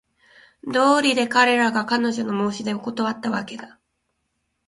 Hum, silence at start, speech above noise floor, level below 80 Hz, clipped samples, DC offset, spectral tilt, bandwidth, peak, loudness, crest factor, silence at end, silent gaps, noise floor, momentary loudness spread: none; 0.65 s; 53 dB; -64 dBFS; under 0.1%; under 0.1%; -4 dB/octave; 11.5 kHz; -2 dBFS; -21 LUFS; 20 dB; 1 s; none; -74 dBFS; 11 LU